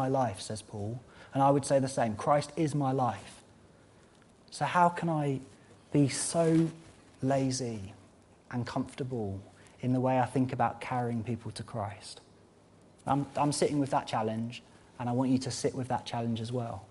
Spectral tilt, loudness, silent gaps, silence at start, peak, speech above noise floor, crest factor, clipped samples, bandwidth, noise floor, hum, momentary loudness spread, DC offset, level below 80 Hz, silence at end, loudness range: -6 dB/octave; -31 LUFS; none; 0 s; -12 dBFS; 29 dB; 20 dB; under 0.1%; 11.5 kHz; -59 dBFS; none; 14 LU; under 0.1%; -64 dBFS; 0.05 s; 4 LU